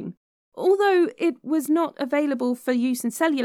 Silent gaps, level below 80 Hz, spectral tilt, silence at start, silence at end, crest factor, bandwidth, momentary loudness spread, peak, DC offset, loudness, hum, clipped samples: 0.17-0.52 s; -82 dBFS; -4.5 dB/octave; 0 s; 0 s; 14 dB; 17.5 kHz; 7 LU; -8 dBFS; under 0.1%; -23 LUFS; none; under 0.1%